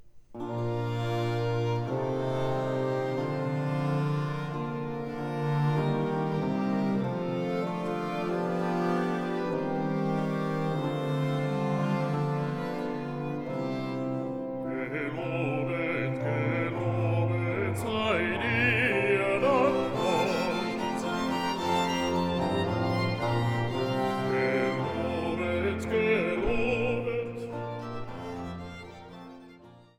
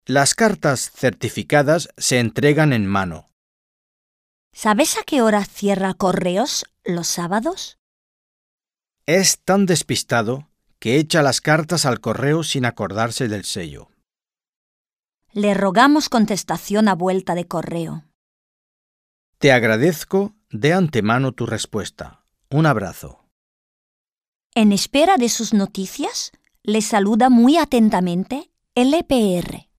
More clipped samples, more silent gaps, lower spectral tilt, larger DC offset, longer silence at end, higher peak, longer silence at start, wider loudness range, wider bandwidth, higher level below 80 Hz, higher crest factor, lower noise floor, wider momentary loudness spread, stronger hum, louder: neither; second, none vs 3.32-4.51 s, 7.79-8.58 s, 14.48-14.85 s, 14.93-15.03 s, 18.15-19.33 s, 23.31-24.05 s, 24.12-24.16 s, 24.28-24.50 s; first, -7 dB/octave vs -4.5 dB/octave; neither; about the same, 0.2 s vs 0.2 s; second, -12 dBFS vs -2 dBFS; about the same, 0 s vs 0.1 s; about the same, 5 LU vs 5 LU; about the same, 15.5 kHz vs 15.5 kHz; about the same, -54 dBFS vs -52 dBFS; about the same, 18 dB vs 18 dB; second, -52 dBFS vs under -90 dBFS; second, 8 LU vs 12 LU; neither; second, -29 LUFS vs -18 LUFS